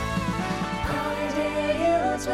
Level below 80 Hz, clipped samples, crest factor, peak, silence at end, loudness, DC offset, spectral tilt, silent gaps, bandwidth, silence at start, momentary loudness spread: -40 dBFS; under 0.1%; 12 dB; -12 dBFS; 0 s; -26 LUFS; under 0.1%; -5.5 dB/octave; none; 16 kHz; 0 s; 5 LU